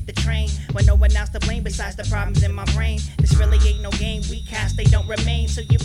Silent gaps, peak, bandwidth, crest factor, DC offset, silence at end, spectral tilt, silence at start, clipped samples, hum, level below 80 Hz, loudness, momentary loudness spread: none; -2 dBFS; 11 kHz; 16 dB; under 0.1%; 0 s; -5.5 dB/octave; 0 s; under 0.1%; none; -20 dBFS; -20 LUFS; 9 LU